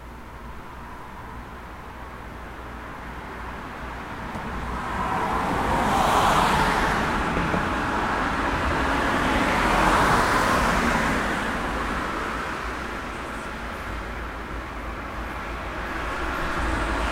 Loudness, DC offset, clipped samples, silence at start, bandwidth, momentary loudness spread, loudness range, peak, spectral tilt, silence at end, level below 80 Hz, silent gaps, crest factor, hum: -24 LUFS; under 0.1%; under 0.1%; 0 s; 16 kHz; 19 LU; 14 LU; -6 dBFS; -4.5 dB/octave; 0 s; -36 dBFS; none; 18 dB; none